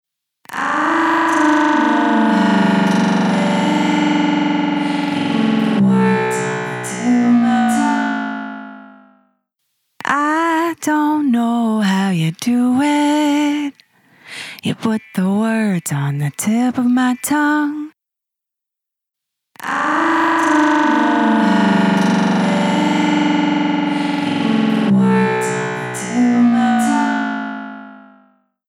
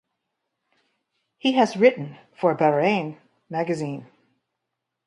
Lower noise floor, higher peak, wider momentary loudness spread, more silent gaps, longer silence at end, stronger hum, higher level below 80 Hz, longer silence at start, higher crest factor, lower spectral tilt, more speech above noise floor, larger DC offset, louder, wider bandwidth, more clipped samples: about the same, -84 dBFS vs -82 dBFS; first, 0 dBFS vs -4 dBFS; second, 9 LU vs 16 LU; neither; second, 0.7 s vs 1.05 s; neither; first, -62 dBFS vs -74 dBFS; second, 0.5 s vs 1.45 s; second, 16 dB vs 22 dB; about the same, -5.5 dB/octave vs -6 dB/octave; first, 67 dB vs 60 dB; neither; first, -16 LUFS vs -22 LUFS; first, 16.5 kHz vs 11 kHz; neither